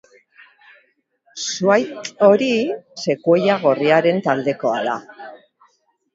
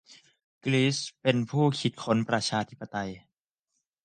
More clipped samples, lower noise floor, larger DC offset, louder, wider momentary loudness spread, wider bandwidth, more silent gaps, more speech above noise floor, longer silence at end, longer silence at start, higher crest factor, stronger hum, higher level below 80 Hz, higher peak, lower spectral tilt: neither; second, -62 dBFS vs -82 dBFS; neither; first, -18 LUFS vs -28 LUFS; first, 14 LU vs 10 LU; second, 7.8 kHz vs 9.6 kHz; second, none vs 0.44-0.61 s; second, 44 dB vs 55 dB; about the same, 0.8 s vs 0.85 s; first, 1.35 s vs 0.1 s; about the same, 20 dB vs 20 dB; neither; about the same, -68 dBFS vs -66 dBFS; first, 0 dBFS vs -10 dBFS; about the same, -5 dB/octave vs -5 dB/octave